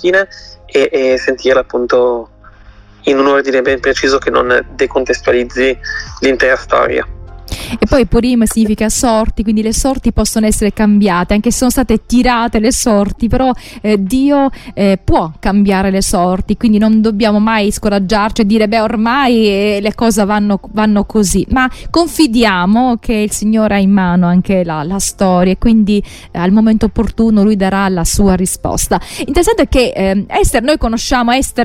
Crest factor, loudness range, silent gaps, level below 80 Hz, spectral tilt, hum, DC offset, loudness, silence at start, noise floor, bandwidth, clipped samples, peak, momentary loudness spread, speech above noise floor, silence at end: 12 dB; 2 LU; none; -26 dBFS; -5 dB/octave; none; under 0.1%; -12 LUFS; 0 s; -39 dBFS; 16 kHz; under 0.1%; 0 dBFS; 5 LU; 27 dB; 0 s